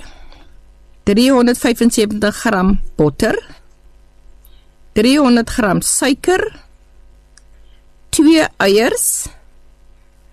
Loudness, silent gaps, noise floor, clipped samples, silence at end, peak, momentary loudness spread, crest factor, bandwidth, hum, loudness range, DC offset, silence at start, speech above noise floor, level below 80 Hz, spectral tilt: -14 LUFS; none; -45 dBFS; under 0.1%; 1.05 s; -2 dBFS; 9 LU; 14 dB; 13 kHz; none; 2 LU; under 0.1%; 0 s; 32 dB; -32 dBFS; -4 dB/octave